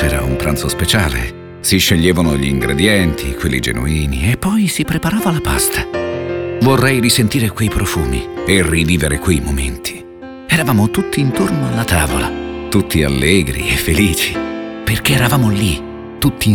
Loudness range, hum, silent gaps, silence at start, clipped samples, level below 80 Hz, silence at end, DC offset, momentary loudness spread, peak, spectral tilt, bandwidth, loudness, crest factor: 2 LU; none; none; 0 s; under 0.1%; -26 dBFS; 0 s; 0.2%; 9 LU; 0 dBFS; -4.5 dB/octave; over 20 kHz; -15 LUFS; 14 dB